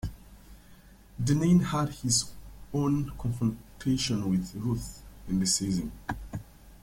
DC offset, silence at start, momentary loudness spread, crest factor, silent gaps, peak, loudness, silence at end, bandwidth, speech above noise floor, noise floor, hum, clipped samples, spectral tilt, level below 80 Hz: under 0.1%; 0.05 s; 17 LU; 16 dB; none; -12 dBFS; -29 LUFS; 0.05 s; 16.5 kHz; 25 dB; -53 dBFS; none; under 0.1%; -5 dB/octave; -48 dBFS